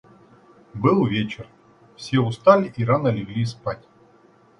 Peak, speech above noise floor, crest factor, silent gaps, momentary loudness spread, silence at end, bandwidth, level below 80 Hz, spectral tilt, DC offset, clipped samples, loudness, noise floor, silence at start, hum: -2 dBFS; 34 dB; 22 dB; none; 20 LU; 0.85 s; 10.5 kHz; -56 dBFS; -7.5 dB/octave; under 0.1%; under 0.1%; -21 LUFS; -54 dBFS; 0.75 s; none